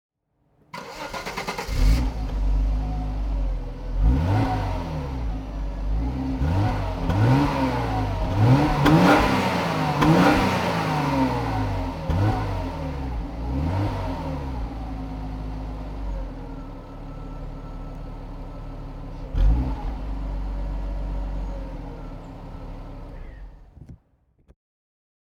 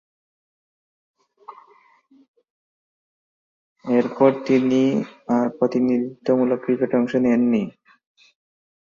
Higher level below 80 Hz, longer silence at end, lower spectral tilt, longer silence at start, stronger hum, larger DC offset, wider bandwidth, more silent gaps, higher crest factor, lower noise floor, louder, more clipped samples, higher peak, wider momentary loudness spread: first, -28 dBFS vs -66 dBFS; first, 1.35 s vs 1.1 s; about the same, -7 dB/octave vs -7.5 dB/octave; second, 0.75 s vs 1.5 s; neither; neither; first, 16.5 kHz vs 7 kHz; second, none vs 2.28-2.34 s, 2.50-3.76 s; about the same, 20 dB vs 20 dB; first, -66 dBFS vs -56 dBFS; second, -24 LUFS vs -20 LUFS; neither; about the same, -4 dBFS vs -2 dBFS; first, 20 LU vs 6 LU